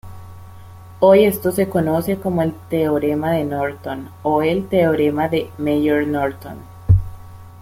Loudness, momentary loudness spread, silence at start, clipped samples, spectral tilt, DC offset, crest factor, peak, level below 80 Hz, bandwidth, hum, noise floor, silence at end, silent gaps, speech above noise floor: -18 LUFS; 14 LU; 0.05 s; under 0.1%; -7.5 dB/octave; under 0.1%; 16 dB; -2 dBFS; -38 dBFS; 16.5 kHz; none; -38 dBFS; 0 s; none; 21 dB